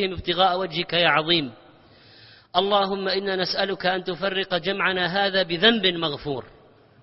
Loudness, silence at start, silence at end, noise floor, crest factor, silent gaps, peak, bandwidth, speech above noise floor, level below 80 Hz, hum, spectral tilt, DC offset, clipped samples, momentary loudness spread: -22 LUFS; 0 s; 0.55 s; -51 dBFS; 22 dB; none; -2 dBFS; 6 kHz; 29 dB; -54 dBFS; none; -7 dB/octave; under 0.1%; under 0.1%; 8 LU